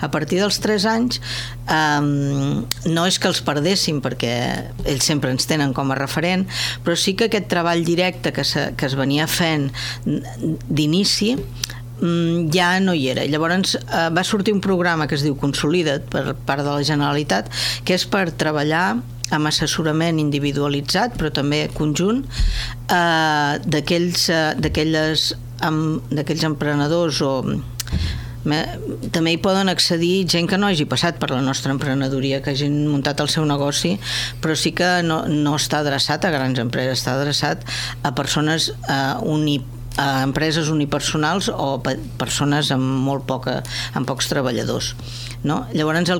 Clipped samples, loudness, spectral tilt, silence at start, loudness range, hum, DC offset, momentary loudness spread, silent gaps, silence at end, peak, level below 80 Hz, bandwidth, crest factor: under 0.1%; -20 LUFS; -4.5 dB/octave; 0 s; 2 LU; none; under 0.1%; 7 LU; none; 0 s; -4 dBFS; -38 dBFS; 19 kHz; 16 dB